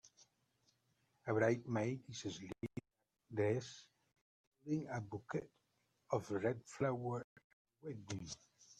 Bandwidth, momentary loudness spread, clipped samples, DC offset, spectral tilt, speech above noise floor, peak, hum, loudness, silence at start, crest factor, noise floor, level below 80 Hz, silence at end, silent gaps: 11 kHz; 17 LU; under 0.1%; under 0.1%; -6 dB/octave; 45 dB; -22 dBFS; none; -42 LUFS; 0.05 s; 22 dB; -86 dBFS; -76 dBFS; 0.05 s; 4.21-4.52 s, 7.24-7.36 s, 7.44-7.65 s